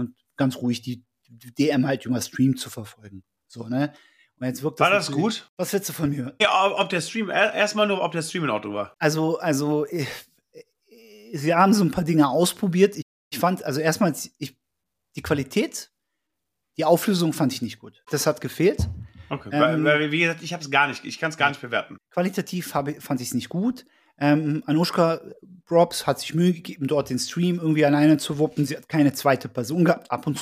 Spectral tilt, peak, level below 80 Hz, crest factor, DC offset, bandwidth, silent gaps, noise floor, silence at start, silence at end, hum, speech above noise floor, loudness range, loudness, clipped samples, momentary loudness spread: -5 dB/octave; -4 dBFS; -52 dBFS; 18 dB; under 0.1%; 15.5 kHz; 5.49-5.57 s, 13.02-13.31 s; -82 dBFS; 0 s; 0 s; none; 59 dB; 5 LU; -23 LUFS; under 0.1%; 12 LU